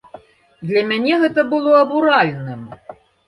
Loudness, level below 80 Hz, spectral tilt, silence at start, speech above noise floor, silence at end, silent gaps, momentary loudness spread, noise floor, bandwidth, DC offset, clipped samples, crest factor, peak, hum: -15 LUFS; -62 dBFS; -7 dB/octave; 0.15 s; 28 dB; 0.35 s; none; 18 LU; -43 dBFS; 11 kHz; under 0.1%; under 0.1%; 16 dB; -2 dBFS; none